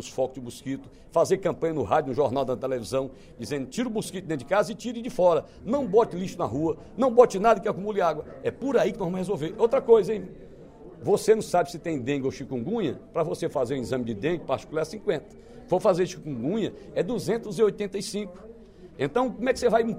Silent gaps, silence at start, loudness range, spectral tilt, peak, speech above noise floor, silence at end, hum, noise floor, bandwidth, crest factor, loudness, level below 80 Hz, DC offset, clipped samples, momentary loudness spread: none; 0 s; 5 LU; -6 dB/octave; -4 dBFS; 21 dB; 0 s; none; -47 dBFS; 15.5 kHz; 22 dB; -26 LUFS; -54 dBFS; under 0.1%; under 0.1%; 11 LU